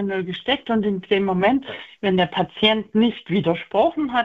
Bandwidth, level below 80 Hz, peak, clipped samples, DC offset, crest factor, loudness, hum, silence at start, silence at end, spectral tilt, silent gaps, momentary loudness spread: 7.2 kHz; -54 dBFS; -2 dBFS; under 0.1%; under 0.1%; 20 dB; -21 LUFS; none; 0 s; 0 s; -7.5 dB/octave; none; 6 LU